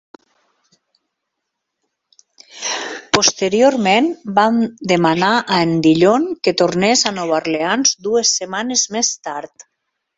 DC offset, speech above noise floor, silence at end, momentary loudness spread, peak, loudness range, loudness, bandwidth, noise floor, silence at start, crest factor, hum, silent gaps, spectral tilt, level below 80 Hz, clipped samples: under 0.1%; 61 dB; 0.7 s; 9 LU; 0 dBFS; 5 LU; -15 LUFS; 8 kHz; -77 dBFS; 2.55 s; 18 dB; none; none; -3 dB/octave; -58 dBFS; under 0.1%